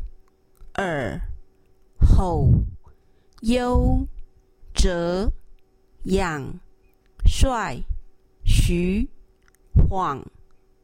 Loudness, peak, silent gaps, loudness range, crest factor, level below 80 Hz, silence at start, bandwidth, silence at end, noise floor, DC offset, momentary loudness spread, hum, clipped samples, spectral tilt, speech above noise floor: -24 LUFS; -2 dBFS; none; 4 LU; 20 dB; -24 dBFS; 0 s; 15.5 kHz; 0.55 s; -56 dBFS; under 0.1%; 16 LU; none; under 0.1%; -6 dB/octave; 35 dB